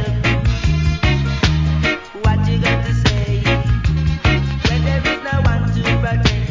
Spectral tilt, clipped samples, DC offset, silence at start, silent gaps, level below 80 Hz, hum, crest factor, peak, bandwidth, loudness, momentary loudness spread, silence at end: -6 dB/octave; under 0.1%; under 0.1%; 0 s; none; -22 dBFS; none; 16 dB; 0 dBFS; 7.6 kHz; -17 LUFS; 2 LU; 0 s